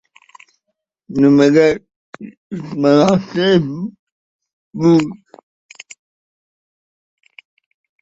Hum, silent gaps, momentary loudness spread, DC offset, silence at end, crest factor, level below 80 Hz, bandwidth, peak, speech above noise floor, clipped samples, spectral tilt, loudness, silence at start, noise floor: none; 1.96-2.13 s, 2.37-2.50 s, 3.99-4.39 s, 4.53-4.71 s; 25 LU; under 0.1%; 2.9 s; 18 dB; -56 dBFS; 8 kHz; 0 dBFS; 62 dB; under 0.1%; -7 dB/octave; -14 LUFS; 1.1 s; -75 dBFS